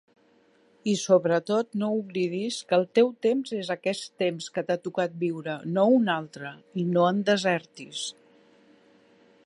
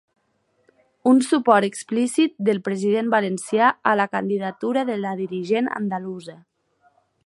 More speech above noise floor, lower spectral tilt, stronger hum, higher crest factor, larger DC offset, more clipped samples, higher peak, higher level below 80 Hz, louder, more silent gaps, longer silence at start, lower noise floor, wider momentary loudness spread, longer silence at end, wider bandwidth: second, 36 dB vs 47 dB; about the same, -5 dB/octave vs -5 dB/octave; neither; about the same, 18 dB vs 20 dB; neither; neither; second, -8 dBFS vs -2 dBFS; about the same, -76 dBFS vs -74 dBFS; second, -26 LUFS vs -21 LUFS; neither; second, 0.85 s vs 1.05 s; second, -62 dBFS vs -68 dBFS; about the same, 12 LU vs 10 LU; first, 1.35 s vs 0.9 s; about the same, 11.5 kHz vs 11.5 kHz